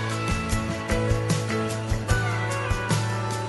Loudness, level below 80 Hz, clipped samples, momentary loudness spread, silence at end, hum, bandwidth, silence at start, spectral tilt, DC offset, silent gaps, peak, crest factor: -26 LUFS; -34 dBFS; under 0.1%; 3 LU; 0 s; none; 12 kHz; 0 s; -5 dB/octave; under 0.1%; none; -10 dBFS; 14 dB